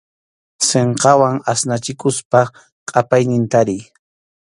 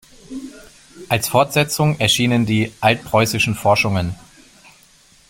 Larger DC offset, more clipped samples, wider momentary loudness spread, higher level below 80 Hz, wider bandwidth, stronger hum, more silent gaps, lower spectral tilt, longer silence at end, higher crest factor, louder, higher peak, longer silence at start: neither; neither; second, 8 LU vs 18 LU; second, -56 dBFS vs -48 dBFS; second, 11.5 kHz vs 16.5 kHz; neither; first, 2.25-2.31 s, 2.72-2.86 s vs none; about the same, -4.5 dB/octave vs -4.5 dB/octave; second, 0.6 s vs 1.15 s; about the same, 16 dB vs 18 dB; about the same, -16 LUFS vs -17 LUFS; about the same, 0 dBFS vs -2 dBFS; first, 0.6 s vs 0.3 s